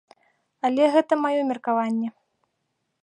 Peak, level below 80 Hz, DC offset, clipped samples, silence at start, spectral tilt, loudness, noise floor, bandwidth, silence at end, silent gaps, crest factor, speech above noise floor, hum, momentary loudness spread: -8 dBFS; -80 dBFS; under 0.1%; under 0.1%; 0.65 s; -5.5 dB/octave; -23 LUFS; -76 dBFS; 10 kHz; 0.9 s; none; 18 dB; 55 dB; none; 9 LU